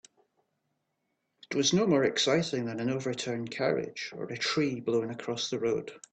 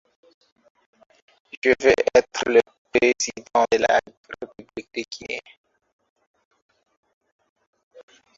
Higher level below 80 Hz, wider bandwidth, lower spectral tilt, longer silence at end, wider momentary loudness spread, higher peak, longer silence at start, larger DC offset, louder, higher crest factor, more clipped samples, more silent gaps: second, -72 dBFS vs -58 dBFS; first, 9 kHz vs 7.8 kHz; first, -4 dB/octave vs -2.5 dB/octave; second, 0.15 s vs 2.95 s; second, 10 LU vs 20 LU; second, -12 dBFS vs -2 dBFS; second, 1.5 s vs 1.65 s; neither; second, -30 LUFS vs -21 LUFS; about the same, 18 dB vs 22 dB; neither; second, none vs 2.78-2.85 s, 4.17-4.24 s